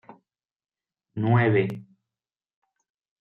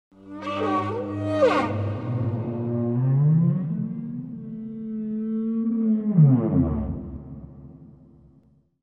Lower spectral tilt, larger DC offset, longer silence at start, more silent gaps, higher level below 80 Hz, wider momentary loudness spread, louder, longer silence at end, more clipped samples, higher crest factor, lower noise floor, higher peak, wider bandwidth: about the same, -10 dB/octave vs -9.5 dB/octave; neither; about the same, 0.1 s vs 0.2 s; first, 0.56-0.60 s vs none; second, -72 dBFS vs -46 dBFS; first, 20 LU vs 16 LU; about the same, -23 LUFS vs -24 LUFS; first, 1.4 s vs 0.9 s; neither; about the same, 20 dB vs 18 dB; first, under -90 dBFS vs -58 dBFS; about the same, -8 dBFS vs -6 dBFS; second, 4.2 kHz vs 7.4 kHz